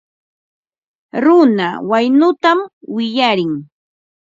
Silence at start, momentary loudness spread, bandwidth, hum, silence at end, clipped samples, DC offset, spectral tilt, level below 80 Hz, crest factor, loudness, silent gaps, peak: 1.15 s; 12 LU; 7.6 kHz; none; 0.7 s; under 0.1%; under 0.1%; -6.5 dB/octave; -66 dBFS; 16 dB; -14 LUFS; 2.73-2.81 s; 0 dBFS